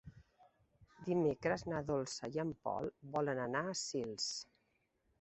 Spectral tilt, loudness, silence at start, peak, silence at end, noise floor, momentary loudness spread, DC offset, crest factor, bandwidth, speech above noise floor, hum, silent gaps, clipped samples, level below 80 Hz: -4.5 dB/octave; -39 LUFS; 0.05 s; -22 dBFS; 0.8 s; -80 dBFS; 6 LU; under 0.1%; 18 dB; 8.2 kHz; 41 dB; none; none; under 0.1%; -68 dBFS